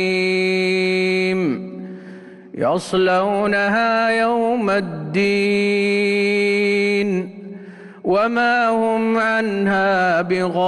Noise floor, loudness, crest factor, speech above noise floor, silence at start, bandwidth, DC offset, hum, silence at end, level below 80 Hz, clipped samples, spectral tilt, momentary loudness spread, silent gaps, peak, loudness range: -38 dBFS; -18 LUFS; 10 dB; 21 dB; 0 s; 12 kHz; under 0.1%; none; 0 s; -58 dBFS; under 0.1%; -5.5 dB/octave; 15 LU; none; -8 dBFS; 2 LU